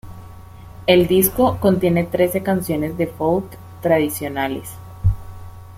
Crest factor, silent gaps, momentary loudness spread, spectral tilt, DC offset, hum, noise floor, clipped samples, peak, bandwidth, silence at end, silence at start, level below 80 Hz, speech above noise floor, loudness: 18 dB; none; 16 LU; -5.5 dB/octave; under 0.1%; none; -38 dBFS; under 0.1%; -2 dBFS; 16.5 kHz; 0 s; 0.05 s; -38 dBFS; 21 dB; -19 LUFS